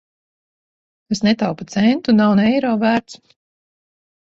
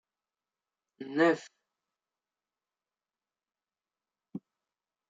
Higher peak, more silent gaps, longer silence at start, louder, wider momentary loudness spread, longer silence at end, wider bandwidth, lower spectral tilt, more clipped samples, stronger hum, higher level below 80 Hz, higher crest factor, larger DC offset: first, -4 dBFS vs -12 dBFS; neither; about the same, 1.1 s vs 1 s; first, -17 LUFS vs -29 LUFS; second, 7 LU vs 20 LU; first, 1.2 s vs 0.7 s; about the same, 7.8 kHz vs 7.8 kHz; about the same, -6 dB/octave vs -5.5 dB/octave; neither; neither; first, -56 dBFS vs -88 dBFS; second, 14 dB vs 26 dB; neither